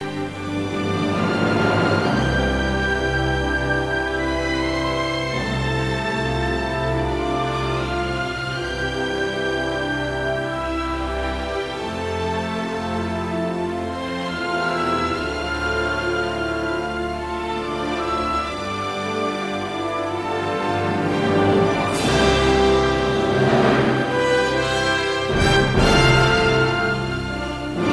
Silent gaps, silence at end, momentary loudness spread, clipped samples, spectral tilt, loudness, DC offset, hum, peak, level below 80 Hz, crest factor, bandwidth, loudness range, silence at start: none; 0 s; 9 LU; under 0.1%; -5.5 dB/octave; -21 LUFS; under 0.1%; none; -4 dBFS; -34 dBFS; 18 dB; 11 kHz; 6 LU; 0 s